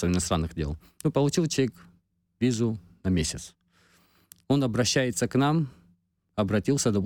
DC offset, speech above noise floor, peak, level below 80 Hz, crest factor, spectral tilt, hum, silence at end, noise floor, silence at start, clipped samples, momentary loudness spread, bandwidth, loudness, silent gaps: under 0.1%; 41 dB; -12 dBFS; -46 dBFS; 16 dB; -5 dB/octave; none; 0 s; -66 dBFS; 0 s; under 0.1%; 10 LU; 18 kHz; -27 LUFS; none